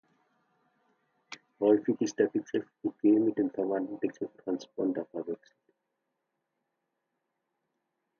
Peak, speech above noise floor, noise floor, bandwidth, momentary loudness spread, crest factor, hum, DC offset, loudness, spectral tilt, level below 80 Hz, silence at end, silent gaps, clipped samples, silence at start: -12 dBFS; 53 dB; -83 dBFS; 7 kHz; 14 LU; 20 dB; none; under 0.1%; -30 LUFS; -6.5 dB/octave; -80 dBFS; 2.85 s; none; under 0.1%; 1.3 s